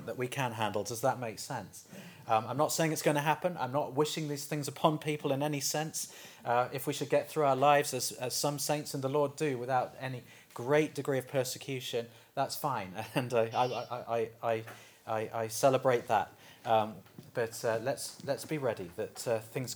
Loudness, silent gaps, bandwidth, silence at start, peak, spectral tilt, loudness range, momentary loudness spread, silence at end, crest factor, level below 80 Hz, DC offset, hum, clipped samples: -33 LUFS; none; over 20 kHz; 0 s; -10 dBFS; -4.5 dB/octave; 4 LU; 11 LU; 0 s; 22 dB; -78 dBFS; under 0.1%; none; under 0.1%